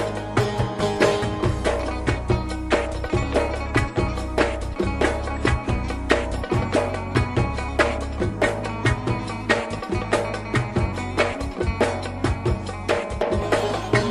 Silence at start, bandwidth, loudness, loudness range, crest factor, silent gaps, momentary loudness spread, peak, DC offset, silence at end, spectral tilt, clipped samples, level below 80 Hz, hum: 0 s; 13 kHz; -24 LUFS; 1 LU; 20 dB; none; 4 LU; -2 dBFS; under 0.1%; 0 s; -6 dB/octave; under 0.1%; -32 dBFS; none